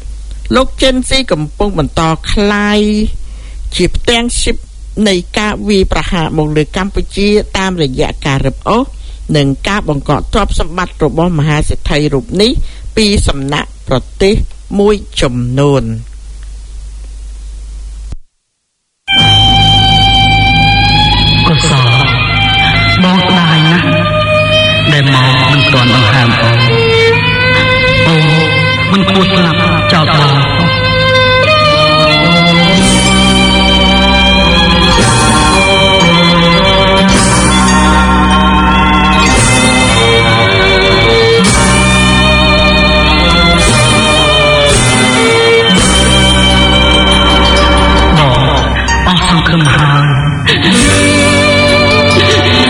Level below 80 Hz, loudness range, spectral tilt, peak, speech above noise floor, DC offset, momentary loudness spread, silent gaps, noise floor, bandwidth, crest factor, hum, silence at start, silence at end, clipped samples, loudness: -18 dBFS; 7 LU; -4.5 dB/octave; 0 dBFS; 54 dB; under 0.1%; 8 LU; none; -65 dBFS; 13.5 kHz; 8 dB; none; 0 s; 0 s; 0.9%; -8 LUFS